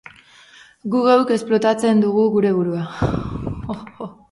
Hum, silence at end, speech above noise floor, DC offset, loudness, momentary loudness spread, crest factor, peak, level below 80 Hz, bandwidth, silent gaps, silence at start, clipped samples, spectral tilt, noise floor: none; 0.2 s; 30 dB; under 0.1%; -18 LUFS; 15 LU; 18 dB; -2 dBFS; -42 dBFS; 11.5 kHz; none; 0.85 s; under 0.1%; -7 dB/octave; -47 dBFS